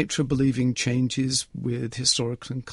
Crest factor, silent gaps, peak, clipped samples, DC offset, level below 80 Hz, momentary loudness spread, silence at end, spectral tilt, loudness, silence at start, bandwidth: 20 dB; none; -6 dBFS; under 0.1%; under 0.1%; -50 dBFS; 8 LU; 0 s; -4 dB/octave; -24 LUFS; 0 s; 11.5 kHz